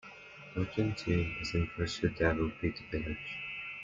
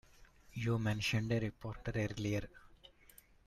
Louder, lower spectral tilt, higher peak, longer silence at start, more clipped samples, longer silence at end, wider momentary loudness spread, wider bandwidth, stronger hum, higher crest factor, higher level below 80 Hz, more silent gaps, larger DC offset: first, -35 LUFS vs -38 LUFS; about the same, -6.5 dB/octave vs -6 dB/octave; first, -14 dBFS vs -24 dBFS; second, 0.05 s vs 0.2 s; neither; second, 0 s vs 0.6 s; second, 8 LU vs 14 LU; second, 7.6 kHz vs 14 kHz; neither; about the same, 20 dB vs 16 dB; first, -50 dBFS vs -58 dBFS; neither; neither